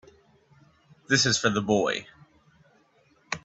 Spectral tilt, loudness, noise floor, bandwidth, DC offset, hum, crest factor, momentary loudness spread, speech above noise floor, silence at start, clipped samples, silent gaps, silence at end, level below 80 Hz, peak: -3 dB/octave; -24 LUFS; -63 dBFS; 8.4 kHz; under 0.1%; none; 22 dB; 11 LU; 39 dB; 1.1 s; under 0.1%; none; 0.05 s; -62 dBFS; -6 dBFS